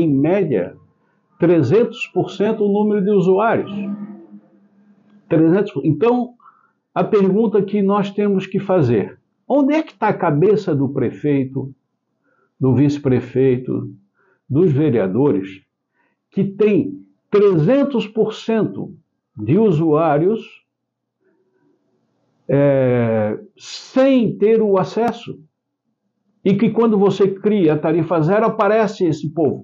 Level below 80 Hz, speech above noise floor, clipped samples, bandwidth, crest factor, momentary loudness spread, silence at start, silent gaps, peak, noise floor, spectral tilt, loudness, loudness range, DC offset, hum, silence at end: -58 dBFS; 61 dB; under 0.1%; 7.4 kHz; 12 dB; 12 LU; 0 s; none; -6 dBFS; -77 dBFS; -8.5 dB/octave; -17 LUFS; 3 LU; under 0.1%; none; 0 s